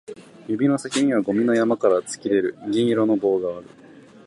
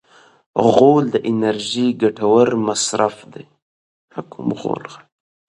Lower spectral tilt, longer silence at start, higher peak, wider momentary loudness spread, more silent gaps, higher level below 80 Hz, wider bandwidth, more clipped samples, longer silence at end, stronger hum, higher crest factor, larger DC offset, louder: about the same, -5.5 dB/octave vs -5 dB/octave; second, 0.1 s vs 0.55 s; second, -4 dBFS vs 0 dBFS; second, 10 LU vs 20 LU; second, none vs 3.62-4.08 s; second, -66 dBFS vs -60 dBFS; about the same, 11.5 kHz vs 11.5 kHz; neither; second, 0.25 s vs 0.5 s; neither; about the same, 16 dB vs 18 dB; neither; second, -21 LUFS vs -17 LUFS